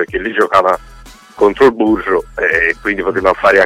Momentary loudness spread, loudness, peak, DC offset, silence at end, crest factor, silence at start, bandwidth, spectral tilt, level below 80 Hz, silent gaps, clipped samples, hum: 6 LU; -13 LUFS; 0 dBFS; under 0.1%; 0 s; 14 dB; 0 s; 14 kHz; -5.5 dB/octave; -38 dBFS; none; under 0.1%; none